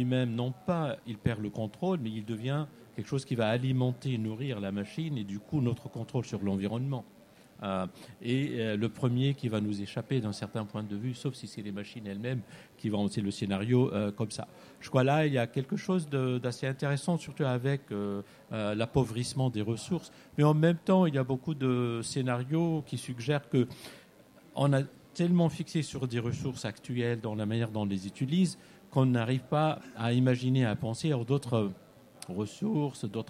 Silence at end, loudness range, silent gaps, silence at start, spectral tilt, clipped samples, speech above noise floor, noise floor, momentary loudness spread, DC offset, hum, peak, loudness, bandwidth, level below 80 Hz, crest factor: 0.05 s; 5 LU; none; 0 s; -7 dB/octave; under 0.1%; 27 dB; -57 dBFS; 11 LU; under 0.1%; none; -12 dBFS; -32 LUFS; 13 kHz; -64 dBFS; 20 dB